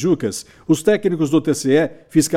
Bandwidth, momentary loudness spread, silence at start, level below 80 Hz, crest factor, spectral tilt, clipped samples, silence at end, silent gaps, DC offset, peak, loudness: 16 kHz; 5 LU; 0 s; -54 dBFS; 14 dB; -5.5 dB/octave; under 0.1%; 0 s; none; under 0.1%; -4 dBFS; -18 LUFS